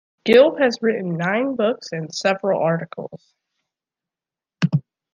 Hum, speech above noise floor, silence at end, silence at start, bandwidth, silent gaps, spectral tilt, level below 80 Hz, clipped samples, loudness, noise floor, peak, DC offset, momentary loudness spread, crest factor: none; 70 dB; 0.35 s; 0.25 s; 9.8 kHz; none; -6 dB/octave; -68 dBFS; under 0.1%; -20 LUFS; -89 dBFS; -2 dBFS; under 0.1%; 14 LU; 18 dB